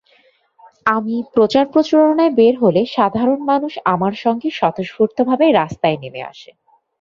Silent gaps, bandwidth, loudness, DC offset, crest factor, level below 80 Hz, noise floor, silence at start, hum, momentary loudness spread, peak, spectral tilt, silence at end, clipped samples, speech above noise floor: none; 7.4 kHz; -16 LUFS; under 0.1%; 14 dB; -56 dBFS; -55 dBFS; 0.85 s; none; 7 LU; -2 dBFS; -7 dB/octave; 0.6 s; under 0.1%; 40 dB